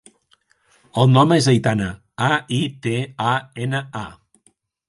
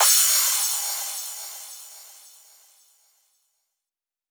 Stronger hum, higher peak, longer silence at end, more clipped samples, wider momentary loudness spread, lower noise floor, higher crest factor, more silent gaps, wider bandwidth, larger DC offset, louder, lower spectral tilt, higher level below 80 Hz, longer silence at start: neither; first, 0 dBFS vs -6 dBFS; second, 0.75 s vs 2.2 s; neither; second, 14 LU vs 24 LU; second, -62 dBFS vs under -90 dBFS; about the same, 20 dB vs 20 dB; neither; second, 11.5 kHz vs over 20 kHz; neither; about the same, -19 LUFS vs -20 LUFS; first, -6 dB/octave vs 8 dB/octave; first, -52 dBFS vs under -90 dBFS; first, 0.95 s vs 0 s